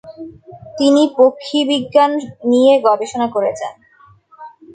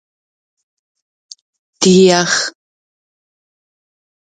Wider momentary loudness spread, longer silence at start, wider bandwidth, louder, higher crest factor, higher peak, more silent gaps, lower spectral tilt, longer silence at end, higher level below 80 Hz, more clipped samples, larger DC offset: first, 20 LU vs 8 LU; second, 0.05 s vs 1.8 s; about the same, 9.2 kHz vs 9.4 kHz; about the same, -14 LUFS vs -12 LUFS; about the same, 16 dB vs 18 dB; about the same, 0 dBFS vs 0 dBFS; neither; about the same, -4.5 dB/octave vs -4 dB/octave; second, 0.05 s vs 1.85 s; about the same, -60 dBFS vs -58 dBFS; neither; neither